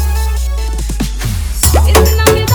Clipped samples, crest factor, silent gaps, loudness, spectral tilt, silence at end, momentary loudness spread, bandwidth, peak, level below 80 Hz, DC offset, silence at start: 0.3%; 10 dB; none; -12 LUFS; -4.5 dB/octave; 0 s; 10 LU; over 20 kHz; 0 dBFS; -14 dBFS; under 0.1%; 0 s